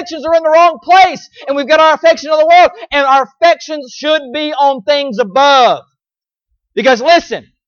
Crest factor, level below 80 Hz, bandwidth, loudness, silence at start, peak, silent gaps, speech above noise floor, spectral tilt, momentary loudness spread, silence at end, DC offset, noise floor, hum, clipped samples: 10 dB; -52 dBFS; 7 kHz; -10 LUFS; 0 s; 0 dBFS; none; over 80 dB; -3 dB/octave; 11 LU; 0.3 s; under 0.1%; under -90 dBFS; none; under 0.1%